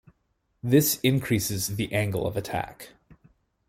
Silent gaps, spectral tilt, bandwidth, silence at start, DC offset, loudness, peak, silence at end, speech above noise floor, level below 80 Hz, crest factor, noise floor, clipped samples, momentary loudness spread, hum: none; -5 dB/octave; 16.5 kHz; 0.65 s; under 0.1%; -25 LUFS; -8 dBFS; 0.8 s; 48 dB; -54 dBFS; 20 dB; -73 dBFS; under 0.1%; 16 LU; none